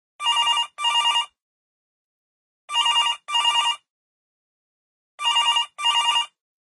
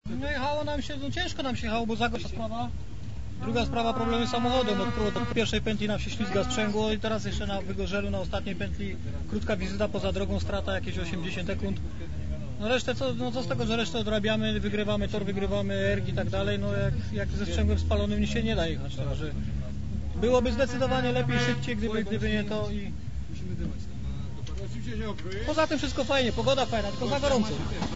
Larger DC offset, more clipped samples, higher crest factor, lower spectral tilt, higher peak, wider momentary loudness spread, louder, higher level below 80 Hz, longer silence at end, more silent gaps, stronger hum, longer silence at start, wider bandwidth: second, under 0.1% vs 2%; neither; about the same, 16 dB vs 18 dB; second, 4 dB/octave vs -5.5 dB/octave; first, -8 dBFS vs -12 dBFS; second, 7 LU vs 10 LU; first, -20 LUFS vs -29 LUFS; second, -80 dBFS vs -38 dBFS; first, 0.45 s vs 0 s; first, 1.42-2.68 s, 3.90-5.18 s vs none; neither; first, 0.2 s vs 0 s; first, 11.5 kHz vs 8 kHz